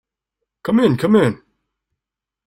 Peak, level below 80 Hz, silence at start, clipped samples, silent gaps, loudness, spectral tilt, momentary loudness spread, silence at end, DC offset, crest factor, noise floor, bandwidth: -2 dBFS; -56 dBFS; 0.65 s; under 0.1%; none; -16 LUFS; -7.5 dB/octave; 15 LU; 1.1 s; under 0.1%; 16 dB; -86 dBFS; 14.5 kHz